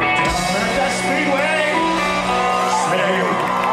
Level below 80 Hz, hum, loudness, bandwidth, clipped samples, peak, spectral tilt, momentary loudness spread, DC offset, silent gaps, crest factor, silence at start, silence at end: -40 dBFS; none; -17 LUFS; 15 kHz; under 0.1%; -4 dBFS; -3.5 dB/octave; 2 LU; under 0.1%; none; 14 dB; 0 s; 0 s